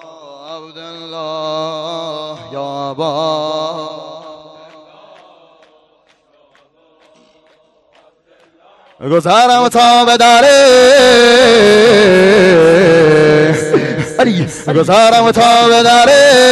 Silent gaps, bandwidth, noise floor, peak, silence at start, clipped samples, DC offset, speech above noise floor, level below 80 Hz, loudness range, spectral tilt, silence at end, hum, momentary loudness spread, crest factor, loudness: none; 12.5 kHz; -53 dBFS; 0 dBFS; 0.45 s; under 0.1%; under 0.1%; 45 dB; -46 dBFS; 16 LU; -4 dB/octave; 0 s; none; 20 LU; 10 dB; -8 LUFS